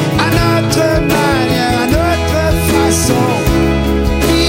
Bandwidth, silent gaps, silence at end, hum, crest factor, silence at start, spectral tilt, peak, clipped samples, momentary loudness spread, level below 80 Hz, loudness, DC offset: 16.5 kHz; none; 0 s; none; 12 dB; 0 s; -5 dB/octave; 0 dBFS; under 0.1%; 2 LU; -20 dBFS; -12 LUFS; under 0.1%